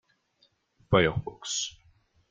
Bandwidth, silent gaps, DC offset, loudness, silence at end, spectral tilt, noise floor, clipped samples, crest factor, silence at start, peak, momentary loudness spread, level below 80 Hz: 9.8 kHz; none; under 0.1%; -28 LUFS; 0.6 s; -4 dB/octave; -69 dBFS; under 0.1%; 24 dB; 0.9 s; -8 dBFS; 11 LU; -52 dBFS